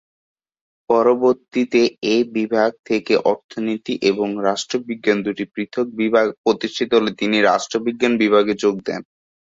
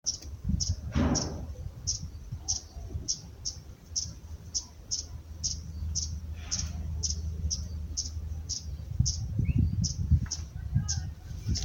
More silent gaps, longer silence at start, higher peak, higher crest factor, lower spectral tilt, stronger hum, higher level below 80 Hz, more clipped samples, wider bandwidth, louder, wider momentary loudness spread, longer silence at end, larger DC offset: first, 2.79-2.84 s, 3.44-3.49 s, 6.38-6.44 s vs none; first, 0.9 s vs 0.05 s; first, -2 dBFS vs -12 dBFS; about the same, 16 dB vs 20 dB; about the same, -4.5 dB/octave vs -4 dB/octave; neither; second, -62 dBFS vs -38 dBFS; neither; second, 7.8 kHz vs 17 kHz; first, -19 LUFS vs -33 LUFS; second, 8 LU vs 11 LU; first, 0.5 s vs 0 s; neither